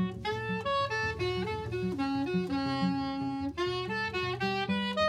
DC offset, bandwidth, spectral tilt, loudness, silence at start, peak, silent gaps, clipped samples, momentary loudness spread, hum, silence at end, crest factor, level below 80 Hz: under 0.1%; 12.5 kHz; -6 dB/octave; -32 LUFS; 0 s; -16 dBFS; none; under 0.1%; 4 LU; none; 0 s; 14 dB; -54 dBFS